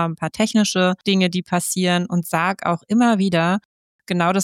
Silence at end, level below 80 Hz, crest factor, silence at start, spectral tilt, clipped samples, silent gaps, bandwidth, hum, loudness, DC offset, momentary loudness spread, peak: 0 s; -62 dBFS; 14 dB; 0 s; -5 dB/octave; under 0.1%; 3.65-3.99 s; 16 kHz; none; -19 LUFS; under 0.1%; 5 LU; -6 dBFS